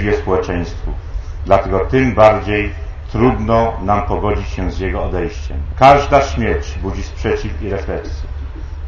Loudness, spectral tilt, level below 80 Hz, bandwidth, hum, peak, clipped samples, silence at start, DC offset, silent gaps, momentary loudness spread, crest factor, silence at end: -16 LUFS; -7 dB/octave; -24 dBFS; 7.4 kHz; none; 0 dBFS; 0.1%; 0 s; under 0.1%; none; 16 LU; 16 dB; 0 s